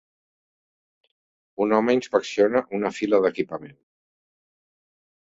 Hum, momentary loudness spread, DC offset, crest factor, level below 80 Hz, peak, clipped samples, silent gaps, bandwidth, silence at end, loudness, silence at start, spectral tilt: none; 10 LU; under 0.1%; 20 dB; -68 dBFS; -4 dBFS; under 0.1%; none; 7.8 kHz; 1.55 s; -23 LUFS; 1.6 s; -5.5 dB/octave